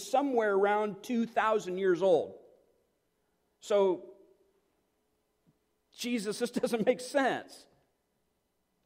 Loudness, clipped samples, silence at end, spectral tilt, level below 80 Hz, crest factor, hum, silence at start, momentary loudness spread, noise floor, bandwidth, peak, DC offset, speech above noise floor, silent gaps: -30 LUFS; under 0.1%; 1.3 s; -4.5 dB/octave; -78 dBFS; 18 dB; none; 0 s; 9 LU; -78 dBFS; 16 kHz; -14 dBFS; under 0.1%; 49 dB; none